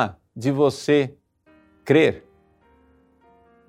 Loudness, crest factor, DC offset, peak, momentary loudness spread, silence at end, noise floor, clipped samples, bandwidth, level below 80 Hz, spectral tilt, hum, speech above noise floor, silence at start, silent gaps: -21 LUFS; 20 dB; under 0.1%; -4 dBFS; 15 LU; 1.5 s; -58 dBFS; under 0.1%; 13 kHz; -62 dBFS; -6.5 dB/octave; none; 39 dB; 0 s; none